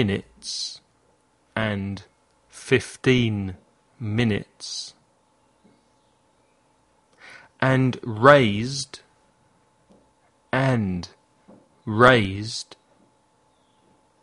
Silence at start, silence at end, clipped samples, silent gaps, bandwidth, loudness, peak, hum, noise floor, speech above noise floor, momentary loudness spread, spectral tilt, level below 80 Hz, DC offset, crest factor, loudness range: 0 s; 1.6 s; under 0.1%; none; 11.5 kHz; -22 LUFS; 0 dBFS; none; -63 dBFS; 42 dB; 21 LU; -5.5 dB/octave; -54 dBFS; under 0.1%; 26 dB; 9 LU